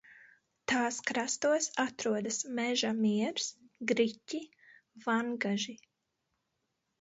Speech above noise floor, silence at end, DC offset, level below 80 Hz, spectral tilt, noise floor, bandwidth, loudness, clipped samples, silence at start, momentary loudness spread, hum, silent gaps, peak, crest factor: 50 dB; 1.25 s; under 0.1%; -78 dBFS; -3 dB/octave; -83 dBFS; 8 kHz; -33 LUFS; under 0.1%; 0.1 s; 11 LU; none; none; -14 dBFS; 20 dB